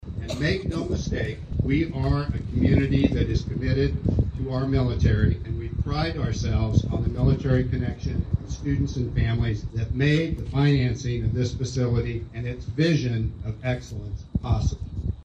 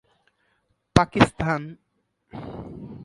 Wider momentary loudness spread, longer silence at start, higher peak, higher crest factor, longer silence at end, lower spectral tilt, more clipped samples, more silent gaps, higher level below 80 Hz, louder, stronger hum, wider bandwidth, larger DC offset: second, 9 LU vs 21 LU; second, 0 s vs 0.95 s; second, -4 dBFS vs 0 dBFS; second, 18 dB vs 26 dB; about the same, 0 s vs 0 s; first, -7.5 dB/octave vs -6 dB/octave; neither; neither; first, -32 dBFS vs -44 dBFS; second, -25 LUFS vs -22 LUFS; neither; second, 8.4 kHz vs 11.5 kHz; neither